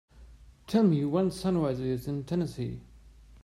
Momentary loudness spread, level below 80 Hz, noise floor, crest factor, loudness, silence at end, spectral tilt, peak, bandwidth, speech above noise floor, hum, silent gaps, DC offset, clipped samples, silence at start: 12 LU; -54 dBFS; -53 dBFS; 16 dB; -29 LUFS; 0.05 s; -8 dB/octave; -14 dBFS; 15 kHz; 25 dB; none; none; under 0.1%; under 0.1%; 0.15 s